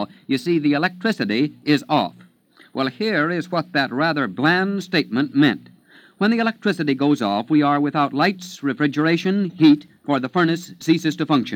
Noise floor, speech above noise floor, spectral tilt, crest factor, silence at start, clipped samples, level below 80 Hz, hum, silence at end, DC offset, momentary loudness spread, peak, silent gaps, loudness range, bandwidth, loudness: -53 dBFS; 33 dB; -6 dB/octave; 18 dB; 0 s; under 0.1%; -72 dBFS; none; 0 s; under 0.1%; 6 LU; -2 dBFS; none; 3 LU; 16 kHz; -20 LUFS